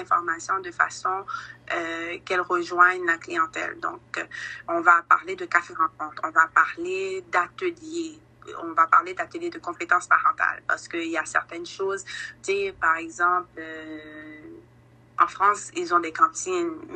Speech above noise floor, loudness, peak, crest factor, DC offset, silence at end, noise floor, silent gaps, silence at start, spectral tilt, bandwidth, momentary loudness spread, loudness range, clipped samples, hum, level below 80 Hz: 29 dB; -24 LUFS; -4 dBFS; 22 dB; under 0.1%; 0 s; -54 dBFS; none; 0 s; -2.5 dB/octave; 9.2 kHz; 16 LU; 4 LU; under 0.1%; none; -66 dBFS